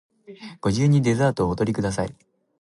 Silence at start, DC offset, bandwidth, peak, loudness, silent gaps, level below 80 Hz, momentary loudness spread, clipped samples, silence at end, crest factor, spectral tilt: 0.3 s; under 0.1%; 11.5 kHz; -8 dBFS; -22 LUFS; none; -46 dBFS; 14 LU; under 0.1%; 0.5 s; 14 dB; -7 dB/octave